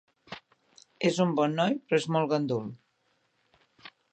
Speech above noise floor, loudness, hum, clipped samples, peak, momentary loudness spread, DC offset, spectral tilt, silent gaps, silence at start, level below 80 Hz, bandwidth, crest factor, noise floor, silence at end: 46 dB; -28 LUFS; none; under 0.1%; -12 dBFS; 20 LU; under 0.1%; -6 dB/octave; none; 0.3 s; -76 dBFS; 9 kHz; 20 dB; -73 dBFS; 0.25 s